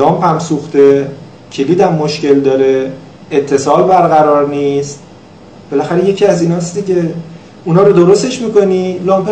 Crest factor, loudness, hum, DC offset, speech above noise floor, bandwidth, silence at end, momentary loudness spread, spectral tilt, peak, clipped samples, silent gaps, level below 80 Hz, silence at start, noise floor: 10 dB; -11 LUFS; none; 0.3%; 26 dB; 9.2 kHz; 0 s; 13 LU; -6.5 dB/octave; 0 dBFS; 0.9%; none; -52 dBFS; 0 s; -36 dBFS